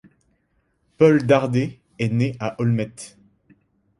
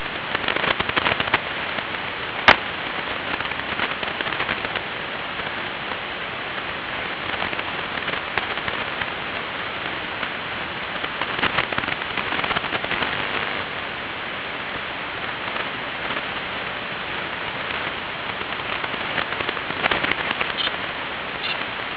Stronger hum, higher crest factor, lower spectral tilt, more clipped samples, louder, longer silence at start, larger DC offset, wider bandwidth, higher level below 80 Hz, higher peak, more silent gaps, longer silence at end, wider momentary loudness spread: neither; second, 20 dB vs 26 dB; first, -7.5 dB/octave vs -5 dB/octave; neither; first, -20 LUFS vs -24 LUFS; first, 1 s vs 0 s; neither; first, 11.5 kHz vs 5.4 kHz; second, -58 dBFS vs -50 dBFS; about the same, -2 dBFS vs 0 dBFS; neither; first, 0.9 s vs 0 s; first, 15 LU vs 7 LU